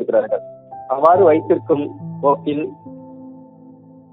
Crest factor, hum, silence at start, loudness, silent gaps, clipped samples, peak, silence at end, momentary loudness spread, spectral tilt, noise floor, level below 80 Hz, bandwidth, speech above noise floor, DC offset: 18 dB; none; 0 s; -17 LUFS; none; under 0.1%; 0 dBFS; 0.75 s; 25 LU; -10 dB/octave; -43 dBFS; -66 dBFS; 4.7 kHz; 27 dB; under 0.1%